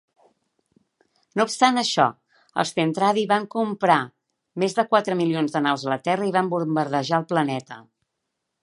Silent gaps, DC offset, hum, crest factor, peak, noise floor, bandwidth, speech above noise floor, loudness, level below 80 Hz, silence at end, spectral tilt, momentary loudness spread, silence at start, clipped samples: none; under 0.1%; none; 22 dB; -2 dBFS; -80 dBFS; 11.5 kHz; 58 dB; -22 LUFS; -74 dBFS; 0.8 s; -5 dB/octave; 9 LU; 1.35 s; under 0.1%